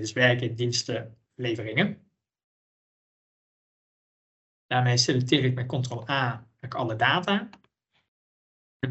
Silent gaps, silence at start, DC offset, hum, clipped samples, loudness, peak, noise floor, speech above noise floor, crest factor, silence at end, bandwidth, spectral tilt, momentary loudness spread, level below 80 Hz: 2.44-4.69 s, 8.08-8.80 s; 0 s; under 0.1%; none; under 0.1%; -26 LUFS; -6 dBFS; under -90 dBFS; over 64 dB; 22 dB; 0 s; 8.4 kHz; -4.5 dB/octave; 13 LU; -68 dBFS